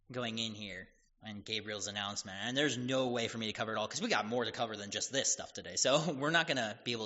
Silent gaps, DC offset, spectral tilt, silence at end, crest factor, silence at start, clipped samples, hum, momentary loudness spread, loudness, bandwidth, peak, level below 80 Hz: none; under 0.1%; -2 dB/octave; 0 s; 22 dB; 0.1 s; under 0.1%; none; 9 LU; -35 LUFS; 8 kHz; -14 dBFS; -72 dBFS